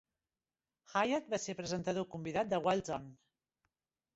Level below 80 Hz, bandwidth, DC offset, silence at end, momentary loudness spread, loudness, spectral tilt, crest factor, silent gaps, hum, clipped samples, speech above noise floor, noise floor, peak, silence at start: -70 dBFS; 8 kHz; under 0.1%; 1 s; 8 LU; -37 LUFS; -4 dB/octave; 20 dB; none; none; under 0.1%; over 54 dB; under -90 dBFS; -18 dBFS; 0.9 s